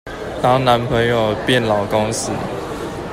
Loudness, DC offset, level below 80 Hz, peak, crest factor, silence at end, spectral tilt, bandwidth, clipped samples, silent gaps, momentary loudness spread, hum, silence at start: -17 LUFS; under 0.1%; -40 dBFS; -2 dBFS; 16 dB; 0 s; -5 dB/octave; 16 kHz; under 0.1%; none; 11 LU; none; 0.05 s